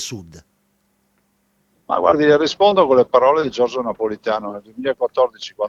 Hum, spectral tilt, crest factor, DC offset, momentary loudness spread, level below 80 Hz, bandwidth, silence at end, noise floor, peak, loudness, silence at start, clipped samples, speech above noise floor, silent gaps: none; -4.5 dB/octave; 18 dB; under 0.1%; 11 LU; -56 dBFS; 12 kHz; 0 s; -64 dBFS; 0 dBFS; -17 LUFS; 0 s; under 0.1%; 47 dB; none